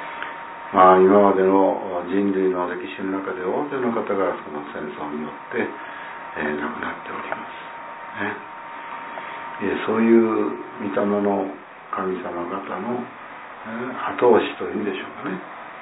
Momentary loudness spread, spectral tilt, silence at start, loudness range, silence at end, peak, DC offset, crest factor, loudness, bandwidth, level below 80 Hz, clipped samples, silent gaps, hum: 17 LU; -10.5 dB/octave; 0 s; 11 LU; 0 s; 0 dBFS; under 0.1%; 22 dB; -22 LUFS; 4 kHz; -64 dBFS; under 0.1%; none; none